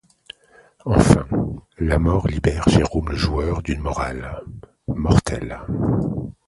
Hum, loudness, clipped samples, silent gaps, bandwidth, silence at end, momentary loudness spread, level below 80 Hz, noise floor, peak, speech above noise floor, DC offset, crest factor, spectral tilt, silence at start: none; -21 LUFS; under 0.1%; none; 11.5 kHz; 0.15 s; 16 LU; -30 dBFS; -53 dBFS; 0 dBFS; 33 dB; under 0.1%; 20 dB; -6.5 dB/octave; 0.85 s